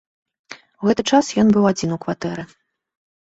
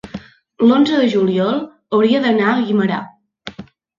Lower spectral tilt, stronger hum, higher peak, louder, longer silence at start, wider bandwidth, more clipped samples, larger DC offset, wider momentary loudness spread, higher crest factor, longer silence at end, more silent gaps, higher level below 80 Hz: second, -5.5 dB/octave vs -7 dB/octave; neither; about the same, -2 dBFS vs -2 dBFS; about the same, -18 LUFS vs -16 LUFS; first, 0.5 s vs 0.05 s; about the same, 8 kHz vs 7.4 kHz; neither; neither; second, 13 LU vs 20 LU; about the same, 18 dB vs 14 dB; first, 0.75 s vs 0.35 s; neither; about the same, -54 dBFS vs -56 dBFS